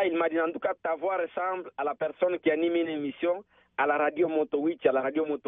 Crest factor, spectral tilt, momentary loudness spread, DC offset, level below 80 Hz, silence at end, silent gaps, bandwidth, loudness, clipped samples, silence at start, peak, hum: 18 dB; -3 dB/octave; 6 LU; under 0.1%; -74 dBFS; 0.1 s; none; 3.9 kHz; -28 LUFS; under 0.1%; 0 s; -10 dBFS; none